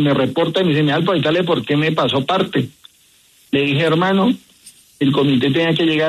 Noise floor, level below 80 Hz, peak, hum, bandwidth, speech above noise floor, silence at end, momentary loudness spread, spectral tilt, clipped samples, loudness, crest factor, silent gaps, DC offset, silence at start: -53 dBFS; -56 dBFS; -4 dBFS; none; 13.5 kHz; 37 dB; 0 s; 5 LU; -7 dB/octave; under 0.1%; -17 LUFS; 12 dB; none; under 0.1%; 0 s